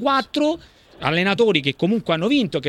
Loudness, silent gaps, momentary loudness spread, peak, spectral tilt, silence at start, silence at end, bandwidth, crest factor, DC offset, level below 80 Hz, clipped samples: -20 LUFS; none; 5 LU; -2 dBFS; -6 dB/octave; 0 s; 0 s; 12 kHz; 18 dB; under 0.1%; -54 dBFS; under 0.1%